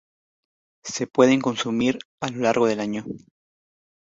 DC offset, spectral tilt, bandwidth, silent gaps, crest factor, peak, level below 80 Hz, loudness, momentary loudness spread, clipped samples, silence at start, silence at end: under 0.1%; -4.5 dB/octave; 8 kHz; 2.05-2.18 s; 22 dB; -2 dBFS; -64 dBFS; -23 LUFS; 16 LU; under 0.1%; 0.85 s; 0.85 s